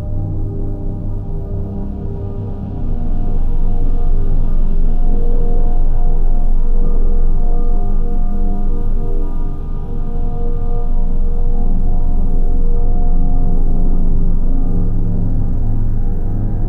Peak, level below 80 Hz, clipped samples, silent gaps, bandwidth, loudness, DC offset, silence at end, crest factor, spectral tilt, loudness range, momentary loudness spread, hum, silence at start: -4 dBFS; -12 dBFS; under 0.1%; none; 1.3 kHz; -21 LUFS; 0.3%; 0 s; 8 dB; -11 dB/octave; 3 LU; 5 LU; none; 0 s